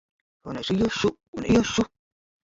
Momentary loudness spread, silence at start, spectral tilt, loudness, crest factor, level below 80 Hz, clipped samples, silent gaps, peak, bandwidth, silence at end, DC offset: 13 LU; 0.45 s; -5 dB/octave; -25 LUFS; 18 dB; -48 dBFS; under 0.1%; 1.28-1.33 s; -8 dBFS; 7.8 kHz; 0.6 s; under 0.1%